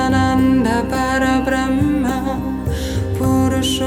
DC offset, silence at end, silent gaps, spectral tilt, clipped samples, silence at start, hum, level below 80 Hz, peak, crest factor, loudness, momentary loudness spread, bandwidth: under 0.1%; 0 s; none; -5.5 dB/octave; under 0.1%; 0 s; none; -30 dBFS; -4 dBFS; 12 dB; -17 LUFS; 7 LU; 16.5 kHz